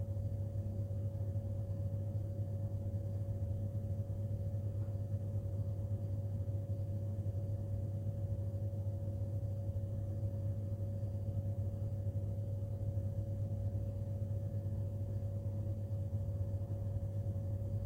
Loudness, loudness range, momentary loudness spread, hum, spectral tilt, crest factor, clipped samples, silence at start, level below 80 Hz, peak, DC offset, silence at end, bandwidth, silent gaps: -40 LUFS; 0 LU; 1 LU; none; -10.5 dB/octave; 10 dB; under 0.1%; 0 s; -52 dBFS; -28 dBFS; under 0.1%; 0 s; 1.9 kHz; none